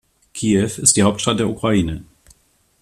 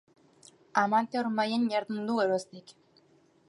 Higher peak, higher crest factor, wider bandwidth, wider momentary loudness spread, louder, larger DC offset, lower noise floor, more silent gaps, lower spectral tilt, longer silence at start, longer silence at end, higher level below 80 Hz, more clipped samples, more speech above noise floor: first, 0 dBFS vs -10 dBFS; about the same, 20 dB vs 22 dB; first, 14 kHz vs 11.5 kHz; first, 13 LU vs 7 LU; first, -17 LUFS vs -29 LUFS; neither; second, -58 dBFS vs -64 dBFS; neither; about the same, -4 dB/octave vs -5 dB/octave; second, 0.35 s vs 0.75 s; about the same, 0.8 s vs 0.8 s; first, -44 dBFS vs -82 dBFS; neither; first, 41 dB vs 35 dB